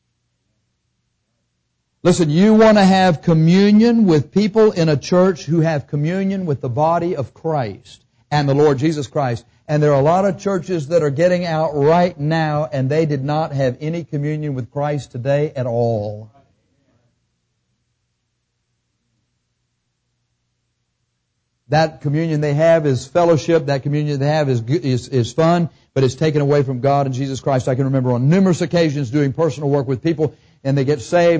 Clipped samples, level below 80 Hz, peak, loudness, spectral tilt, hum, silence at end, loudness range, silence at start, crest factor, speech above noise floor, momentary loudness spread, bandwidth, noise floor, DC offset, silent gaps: under 0.1%; -50 dBFS; -4 dBFS; -17 LUFS; -7 dB/octave; 60 Hz at -45 dBFS; 0 s; 9 LU; 2.05 s; 12 dB; 55 dB; 9 LU; 8 kHz; -71 dBFS; under 0.1%; none